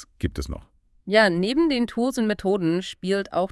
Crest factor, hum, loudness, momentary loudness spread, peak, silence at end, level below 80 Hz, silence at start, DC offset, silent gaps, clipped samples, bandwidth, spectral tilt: 20 dB; none; -23 LUFS; 15 LU; -4 dBFS; 0.05 s; -44 dBFS; 0 s; under 0.1%; none; under 0.1%; 12 kHz; -5.5 dB/octave